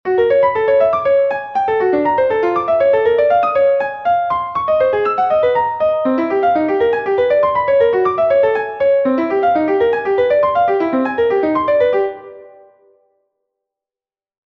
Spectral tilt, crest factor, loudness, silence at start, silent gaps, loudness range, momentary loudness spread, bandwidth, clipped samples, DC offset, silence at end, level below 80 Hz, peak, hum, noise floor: -7.5 dB/octave; 12 dB; -15 LUFS; 0.05 s; none; 3 LU; 4 LU; 5.8 kHz; under 0.1%; under 0.1%; 2.1 s; -52 dBFS; -4 dBFS; none; under -90 dBFS